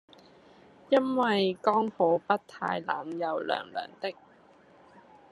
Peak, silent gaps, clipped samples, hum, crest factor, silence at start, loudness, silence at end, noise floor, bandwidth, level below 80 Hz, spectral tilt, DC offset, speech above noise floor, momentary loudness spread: -8 dBFS; none; under 0.1%; none; 22 dB; 0.9 s; -29 LUFS; 1.2 s; -58 dBFS; 11 kHz; -78 dBFS; -6.5 dB/octave; under 0.1%; 30 dB; 11 LU